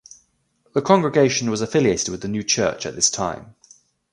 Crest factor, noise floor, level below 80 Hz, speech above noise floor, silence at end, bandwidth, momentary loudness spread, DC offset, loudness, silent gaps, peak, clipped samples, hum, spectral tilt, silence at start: 20 dB; -65 dBFS; -52 dBFS; 45 dB; 0.6 s; 11.5 kHz; 9 LU; under 0.1%; -20 LUFS; none; 0 dBFS; under 0.1%; none; -3.5 dB/octave; 0.75 s